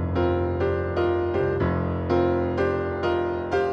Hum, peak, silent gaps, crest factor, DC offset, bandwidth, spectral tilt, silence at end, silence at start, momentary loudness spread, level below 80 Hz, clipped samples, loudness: none; -10 dBFS; none; 14 dB; under 0.1%; 6.6 kHz; -9 dB/octave; 0 s; 0 s; 2 LU; -40 dBFS; under 0.1%; -24 LUFS